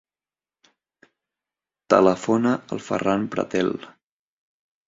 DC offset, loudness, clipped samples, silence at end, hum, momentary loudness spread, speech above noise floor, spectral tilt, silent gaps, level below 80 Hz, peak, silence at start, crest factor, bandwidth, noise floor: under 0.1%; -22 LUFS; under 0.1%; 1 s; none; 10 LU; over 69 dB; -6 dB/octave; none; -62 dBFS; -2 dBFS; 1.9 s; 24 dB; 7.8 kHz; under -90 dBFS